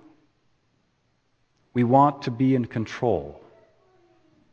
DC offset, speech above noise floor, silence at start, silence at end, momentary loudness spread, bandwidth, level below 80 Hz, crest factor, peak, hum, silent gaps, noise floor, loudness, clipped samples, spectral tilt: under 0.1%; 47 dB; 1.75 s; 1.15 s; 12 LU; 7.2 kHz; -58 dBFS; 20 dB; -6 dBFS; none; none; -69 dBFS; -23 LUFS; under 0.1%; -8.5 dB/octave